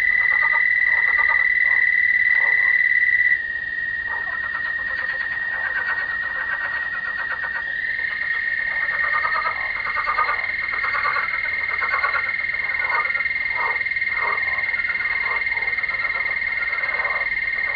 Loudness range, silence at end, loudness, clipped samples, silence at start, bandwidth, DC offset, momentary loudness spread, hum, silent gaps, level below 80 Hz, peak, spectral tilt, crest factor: 7 LU; 0 s; -19 LUFS; under 0.1%; 0 s; 5.4 kHz; under 0.1%; 8 LU; none; none; -52 dBFS; -8 dBFS; -4 dB/octave; 14 dB